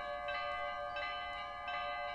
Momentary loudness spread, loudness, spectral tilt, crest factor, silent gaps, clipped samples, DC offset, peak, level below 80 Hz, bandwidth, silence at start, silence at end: 3 LU; -40 LUFS; -3 dB/octave; 12 dB; none; under 0.1%; under 0.1%; -28 dBFS; -62 dBFS; 11 kHz; 0 s; 0 s